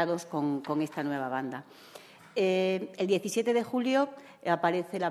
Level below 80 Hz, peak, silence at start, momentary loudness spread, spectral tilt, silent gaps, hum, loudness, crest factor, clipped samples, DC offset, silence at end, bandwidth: -80 dBFS; -12 dBFS; 0 s; 13 LU; -5.5 dB/octave; none; none; -30 LUFS; 18 dB; under 0.1%; under 0.1%; 0 s; 14 kHz